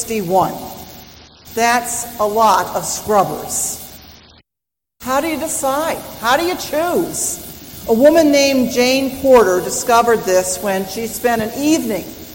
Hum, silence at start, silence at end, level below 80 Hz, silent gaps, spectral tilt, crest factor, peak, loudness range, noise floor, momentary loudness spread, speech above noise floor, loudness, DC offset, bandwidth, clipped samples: none; 0 s; 0 s; -46 dBFS; none; -3 dB/octave; 16 dB; 0 dBFS; 7 LU; -84 dBFS; 14 LU; 69 dB; -16 LUFS; under 0.1%; 17 kHz; under 0.1%